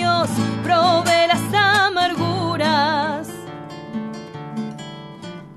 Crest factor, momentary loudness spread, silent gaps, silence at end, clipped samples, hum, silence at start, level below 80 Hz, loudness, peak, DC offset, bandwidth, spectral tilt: 16 dB; 18 LU; none; 0 s; under 0.1%; none; 0 s; -58 dBFS; -18 LUFS; -4 dBFS; under 0.1%; 13 kHz; -4.5 dB/octave